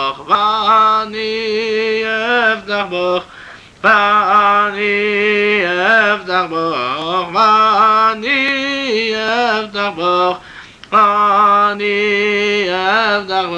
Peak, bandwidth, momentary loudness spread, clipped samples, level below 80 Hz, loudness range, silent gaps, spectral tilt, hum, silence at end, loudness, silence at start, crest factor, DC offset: -2 dBFS; 9.4 kHz; 7 LU; under 0.1%; -54 dBFS; 2 LU; none; -4 dB/octave; none; 0 s; -13 LUFS; 0 s; 12 dB; under 0.1%